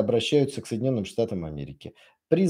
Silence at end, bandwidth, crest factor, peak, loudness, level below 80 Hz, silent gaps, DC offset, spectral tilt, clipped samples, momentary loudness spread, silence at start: 0 s; 13 kHz; 20 dB; -6 dBFS; -26 LUFS; -56 dBFS; none; under 0.1%; -6.5 dB/octave; under 0.1%; 18 LU; 0 s